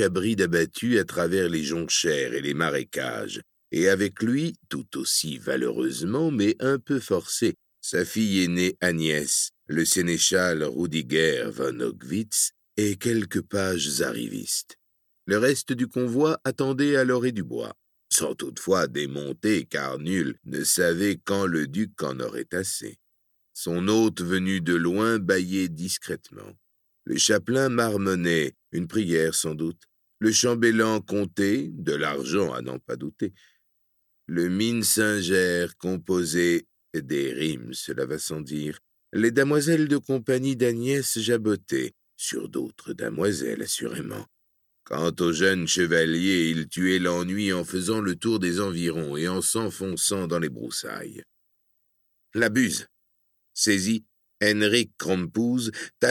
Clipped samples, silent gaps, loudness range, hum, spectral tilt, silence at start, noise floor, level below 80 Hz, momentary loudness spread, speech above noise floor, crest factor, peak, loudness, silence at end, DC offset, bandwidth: under 0.1%; none; 4 LU; none; -4 dB/octave; 0 s; -71 dBFS; -62 dBFS; 11 LU; 46 dB; 18 dB; -8 dBFS; -25 LUFS; 0 s; under 0.1%; 17.5 kHz